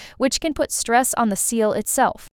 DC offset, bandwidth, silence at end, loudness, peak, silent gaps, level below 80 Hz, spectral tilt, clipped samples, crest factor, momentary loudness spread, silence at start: under 0.1%; 19.5 kHz; 0.05 s; -20 LUFS; -6 dBFS; none; -48 dBFS; -2.5 dB/octave; under 0.1%; 16 dB; 4 LU; 0 s